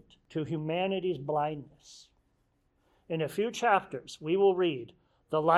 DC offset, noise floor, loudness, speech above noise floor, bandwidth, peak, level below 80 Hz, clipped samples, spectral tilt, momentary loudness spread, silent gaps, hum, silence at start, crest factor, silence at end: under 0.1%; -73 dBFS; -31 LUFS; 43 dB; 14 kHz; -10 dBFS; -70 dBFS; under 0.1%; -6 dB/octave; 15 LU; none; none; 0.35 s; 20 dB; 0 s